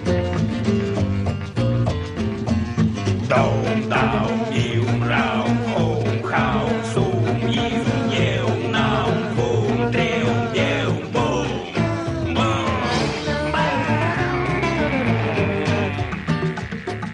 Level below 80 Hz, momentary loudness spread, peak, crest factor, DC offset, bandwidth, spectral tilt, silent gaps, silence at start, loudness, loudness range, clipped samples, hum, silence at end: -38 dBFS; 4 LU; -4 dBFS; 16 dB; under 0.1%; 10.5 kHz; -6.5 dB/octave; none; 0 s; -21 LUFS; 1 LU; under 0.1%; none; 0 s